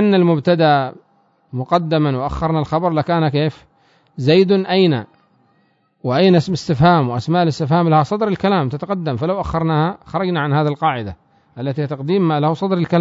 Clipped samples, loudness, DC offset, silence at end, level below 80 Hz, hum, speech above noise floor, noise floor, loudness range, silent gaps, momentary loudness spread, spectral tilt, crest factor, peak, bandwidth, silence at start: under 0.1%; -17 LUFS; under 0.1%; 0 s; -44 dBFS; none; 44 dB; -60 dBFS; 4 LU; none; 9 LU; -8 dB/octave; 14 dB; -2 dBFS; 7.8 kHz; 0 s